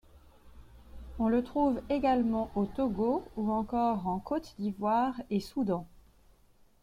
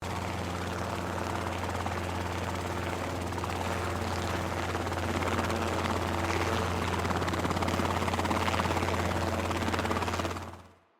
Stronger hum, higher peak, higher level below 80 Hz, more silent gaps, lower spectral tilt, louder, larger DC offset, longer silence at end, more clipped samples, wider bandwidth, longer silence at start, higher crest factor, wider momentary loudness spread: neither; second, -16 dBFS vs -12 dBFS; about the same, -52 dBFS vs -52 dBFS; neither; first, -8 dB/octave vs -5 dB/octave; about the same, -31 LUFS vs -31 LUFS; neither; first, 0.85 s vs 0.25 s; neither; second, 14.5 kHz vs 16.5 kHz; first, 0.15 s vs 0 s; about the same, 16 dB vs 18 dB; about the same, 6 LU vs 5 LU